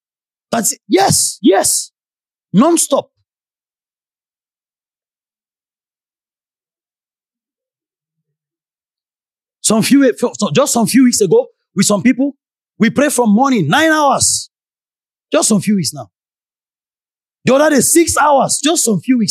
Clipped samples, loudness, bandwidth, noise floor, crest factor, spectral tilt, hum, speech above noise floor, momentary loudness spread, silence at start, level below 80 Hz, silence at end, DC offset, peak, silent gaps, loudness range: under 0.1%; -12 LUFS; 15.5 kHz; under -90 dBFS; 16 dB; -3.5 dB/octave; none; over 78 dB; 8 LU; 0.5 s; -52 dBFS; 0 s; under 0.1%; 0 dBFS; none; 6 LU